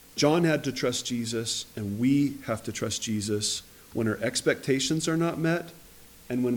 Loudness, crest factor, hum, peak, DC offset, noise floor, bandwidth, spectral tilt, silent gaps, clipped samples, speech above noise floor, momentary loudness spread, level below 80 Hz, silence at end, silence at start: -28 LUFS; 18 dB; none; -10 dBFS; under 0.1%; -51 dBFS; 19.5 kHz; -4.5 dB/octave; none; under 0.1%; 24 dB; 8 LU; -60 dBFS; 0 s; 0.15 s